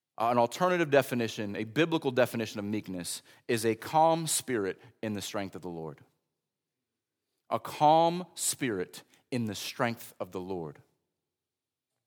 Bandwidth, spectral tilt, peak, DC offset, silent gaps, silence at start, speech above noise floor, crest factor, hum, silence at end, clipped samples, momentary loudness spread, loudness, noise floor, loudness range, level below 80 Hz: over 20 kHz; -4 dB/octave; -10 dBFS; under 0.1%; none; 0.2 s; over 60 dB; 22 dB; none; 1.35 s; under 0.1%; 14 LU; -30 LUFS; under -90 dBFS; 7 LU; -76 dBFS